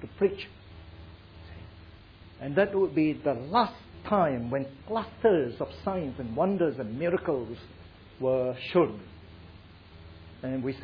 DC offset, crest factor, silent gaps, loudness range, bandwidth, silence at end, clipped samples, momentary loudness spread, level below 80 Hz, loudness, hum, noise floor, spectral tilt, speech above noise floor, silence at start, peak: under 0.1%; 20 dB; none; 4 LU; 5.4 kHz; 0 s; under 0.1%; 23 LU; -56 dBFS; -29 LUFS; none; -51 dBFS; -9.5 dB/octave; 23 dB; 0 s; -10 dBFS